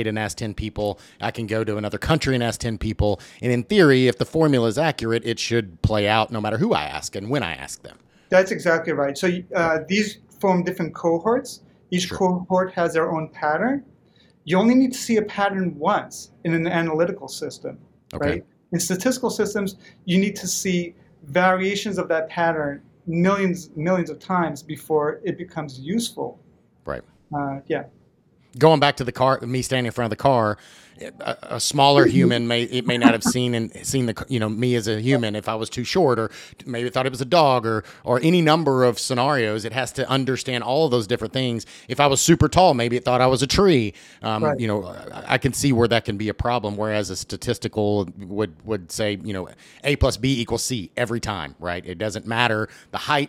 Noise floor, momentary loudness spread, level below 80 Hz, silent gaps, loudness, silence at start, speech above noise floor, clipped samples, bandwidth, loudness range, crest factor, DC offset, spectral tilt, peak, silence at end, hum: -59 dBFS; 13 LU; -46 dBFS; none; -22 LUFS; 0 s; 37 dB; under 0.1%; 17 kHz; 6 LU; 22 dB; under 0.1%; -5 dB/octave; 0 dBFS; 0 s; none